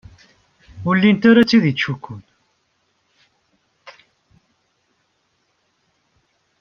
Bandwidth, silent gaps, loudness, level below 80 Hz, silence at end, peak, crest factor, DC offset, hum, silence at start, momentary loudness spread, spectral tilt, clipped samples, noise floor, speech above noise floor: 6.8 kHz; none; -15 LUFS; -58 dBFS; 2.7 s; -2 dBFS; 20 dB; under 0.1%; none; 0.75 s; 21 LU; -7 dB/octave; under 0.1%; -67 dBFS; 52 dB